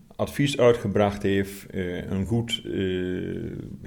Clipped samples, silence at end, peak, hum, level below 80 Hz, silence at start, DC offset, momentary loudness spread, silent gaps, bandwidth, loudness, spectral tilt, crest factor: under 0.1%; 0 s; -8 dBFS; none; -48 dBFS; 0.1 s; under 0.1%; 12 LU; none; 18.5 kHz; -26 LUFS; -6 dB/octave; 18 dB